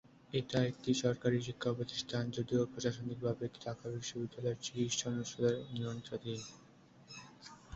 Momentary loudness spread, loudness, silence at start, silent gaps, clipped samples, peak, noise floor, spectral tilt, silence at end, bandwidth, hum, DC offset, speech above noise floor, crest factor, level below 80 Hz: 11 LU; -38 LUFS; 0.3 s; none; under 0.1%; -18 dBFS; -59 dBFS; -5.5 dB/octave; 0 s; 8 kHz; none; under 0.1%; 22 dB; 20 dB; -68 dBFS